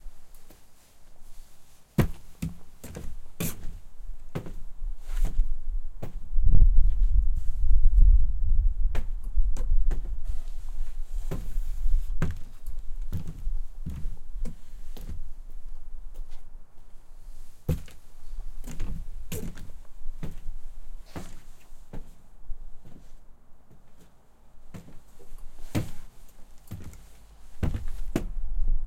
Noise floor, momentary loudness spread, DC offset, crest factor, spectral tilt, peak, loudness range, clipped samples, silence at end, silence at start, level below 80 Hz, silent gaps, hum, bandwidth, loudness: -50 dBFS; 23 LU; under 0.1%; 18 dB; -6.5 dB/octave; -4 dBFS; 20 LU; under 0.1%; 0 s; 0.05 s; -28 dBFS; none; none; 13.5 kHz; -33 LUFS